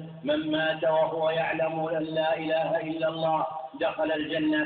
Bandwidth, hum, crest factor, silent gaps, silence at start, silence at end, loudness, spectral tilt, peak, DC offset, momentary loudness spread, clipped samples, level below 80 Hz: 4.6 kHz; none; 14 dB; none; 0 s; 0 s; -27 LUFS; -9.5 dB/octave; -14 dBFS; under 0.1%; 5 LU; under 0.1%; -66 dBFS